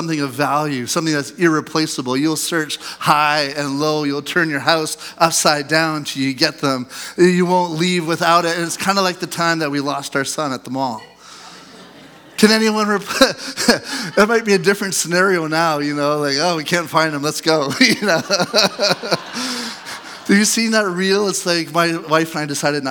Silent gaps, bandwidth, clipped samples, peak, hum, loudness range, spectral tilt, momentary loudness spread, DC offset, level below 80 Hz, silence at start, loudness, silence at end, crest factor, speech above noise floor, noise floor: none; 19.5 kHz; under 0.1%; 0 dBFS; none; 3 LU; -3.5 dB/octave; 8 LU; under 0.1%; -60 dBFS; 0 s; -17 LUFS; 0 s; 18 dB; 24 dB; -42 dBFS